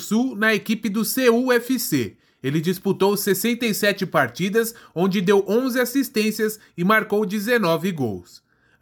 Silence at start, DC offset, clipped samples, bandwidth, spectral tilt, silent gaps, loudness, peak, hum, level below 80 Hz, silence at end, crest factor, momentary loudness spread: 0 s; under 0.1%; under 0.1%; 19.5 kHz; -4.5 dB/octave; none; -21 LUFS; -4 dBFS; none; -68 dBFS; 0.6 s; 18 dB; 7 LU